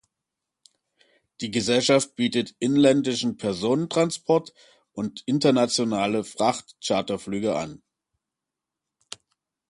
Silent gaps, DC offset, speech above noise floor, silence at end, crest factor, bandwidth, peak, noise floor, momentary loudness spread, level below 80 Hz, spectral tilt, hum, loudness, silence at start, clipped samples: none; under 0.1%; 63 dB; 1.95 s; 20 dB; 11.5 kHz; -6 dBFS; -87 dBFS; 14 LU; -64 dBFS; -4.5 dB/octave; none; -24 LUFS; 1.4 s; under 0.1%